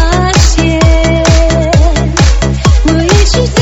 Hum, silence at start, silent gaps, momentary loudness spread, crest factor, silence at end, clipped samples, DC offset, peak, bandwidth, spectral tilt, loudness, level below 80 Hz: none; 0 s; none; 1 LU; 6 dB; 0 s; 1%; under 0.1%; 0 dBFS; 8.2 kHz; -5 dB/octave; -9 LUFS; -10 dBFS